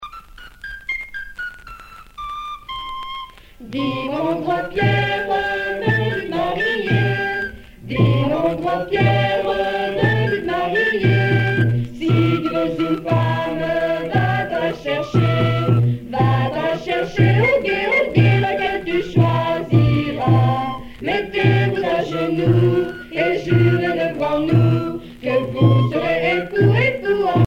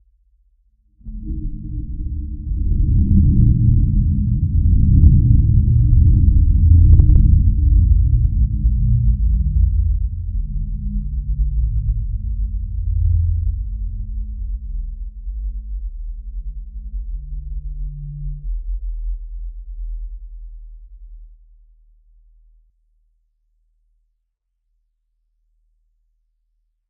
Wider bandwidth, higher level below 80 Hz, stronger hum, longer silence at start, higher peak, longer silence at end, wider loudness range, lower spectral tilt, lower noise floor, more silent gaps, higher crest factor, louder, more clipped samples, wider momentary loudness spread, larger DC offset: first, 6.6 kHz vs 0.6 kHz; second, -42 dBFS vs -20 dBFS; neither; second, 0 s vs 1.05 s; about the same, -2 dBFS vs 0 dBFS; second, 0 s vs 5.6 s; second, 5 LU vs 18 LU; second, -8 dB/octave vs -18 dB/octave; second, -39 dBFS vs -72 dBFS; neither; about the same, 16 dB vs 18 dB; about the same, -18 LUFS vs -18 LUFS; neither; second, 13 LU vs 19 LU; neither